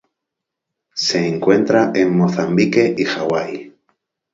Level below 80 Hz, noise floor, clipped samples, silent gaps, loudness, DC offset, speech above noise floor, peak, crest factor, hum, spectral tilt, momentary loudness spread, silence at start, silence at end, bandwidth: -58 dBFS; -81 dBFS; under 0.1%; none; -16 LUFS; under 0.1%; 65 dB; 0 dBFS; 18 dB; none; -5.5 dB/octave; 8 LU; 0.95 s; 0.65 s; 7.8 kHz